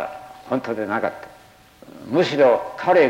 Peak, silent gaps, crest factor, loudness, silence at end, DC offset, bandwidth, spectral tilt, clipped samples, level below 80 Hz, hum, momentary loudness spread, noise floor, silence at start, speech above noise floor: -6 dBFS; none; 16 dB; -21 LUFS; 0 s; under 0.1%; 16 kHz; -6 dB/octave; under 0.1%; -62 dBFS; none; 21 LU; -49 dBFS; 0 s; 30 dB